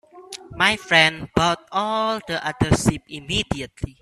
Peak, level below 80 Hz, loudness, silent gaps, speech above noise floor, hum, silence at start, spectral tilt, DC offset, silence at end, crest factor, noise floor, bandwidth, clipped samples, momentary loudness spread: 0 dBFS; -42 dBFS; -20 LUFS; none; 19 dB; none; 0.15 s; -4 dB/octave; under 0.1%; 0.1 s; 22 dB; -40 dBFS; 14 kHz; under 0.1%; 17 LU